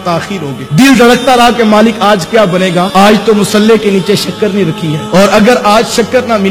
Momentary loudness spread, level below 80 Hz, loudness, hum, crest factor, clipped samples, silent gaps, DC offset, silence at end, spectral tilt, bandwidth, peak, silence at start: 7 LU; -38 dBFS; -7 LUFS; none; 8 dB; 3%; none; under 0.1%; 0 s; -5 dB/octave; 18 kHz; 0 dBFS; 0 s